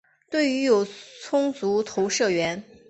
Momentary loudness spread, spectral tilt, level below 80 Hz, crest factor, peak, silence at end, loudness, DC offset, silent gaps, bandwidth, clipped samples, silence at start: 8 LU; -4 dB/octave; -68 dBFS; 16 dB; -8 dBFS; 0.3 s; -24 LUFS; under 0.1%; none; 8.4 kHz; under 0.1%; 0.3 s